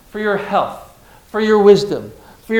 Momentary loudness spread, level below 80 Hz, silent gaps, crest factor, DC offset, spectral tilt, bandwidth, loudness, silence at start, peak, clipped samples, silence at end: 16 LU; -50 dBFS; none; 16 dB; under 0.1%; -6 dB/octave; 14 kHz; -15 LUFS; 0.15 s; 0 dBFS; 0.2%; 0 s